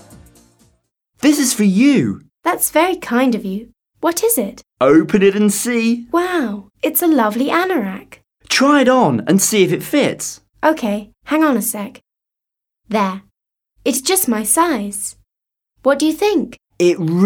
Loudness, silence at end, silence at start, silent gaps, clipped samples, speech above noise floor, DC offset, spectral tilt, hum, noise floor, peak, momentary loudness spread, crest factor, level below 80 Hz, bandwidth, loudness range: -16 LUFS; 0 s; 1.25 s; none; under 0.1%; 69 dB; under 0.1%; -4 dB/octave; none; -84 dBFS; -2 dBFS; 12 LU; 16 dB; -54 dBFS; 19.5 kHz; 5 LU